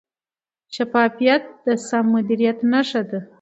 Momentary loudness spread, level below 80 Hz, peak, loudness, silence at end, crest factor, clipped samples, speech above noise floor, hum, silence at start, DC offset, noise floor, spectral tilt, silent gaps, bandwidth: 8 LU; -72 dBFS; -2 dBFS; -20 LUFS; 0.15 s; 18 dB; under 0.1%; over 71 dB; none; 0.7 s; under 0.1%; under -90 dBFS; -5 dB/octave; none; 8.2 kHz